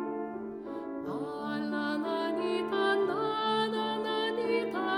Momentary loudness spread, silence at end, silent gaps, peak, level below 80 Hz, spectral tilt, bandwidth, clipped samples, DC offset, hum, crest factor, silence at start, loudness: 10 LU; 0 s; none; -16 dBFS; -72 dBFS; -5.5 dB/octave; 15 kHz; under 0.1%; under 0.1%; none; 16 dB; 0 s; -32 LUFS